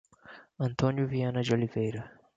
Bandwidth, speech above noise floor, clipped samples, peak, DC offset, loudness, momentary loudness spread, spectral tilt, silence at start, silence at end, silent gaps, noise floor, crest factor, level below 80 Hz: 7.8 kHz; 24 dB; under 0.1%; -12 dBFS; under 0.1%; -30 LUFS; 9 LU; -7.5 dB/octave; 0.25 s; 0.25 s; none; -54 dBFS; 18 dB; -60 dBFS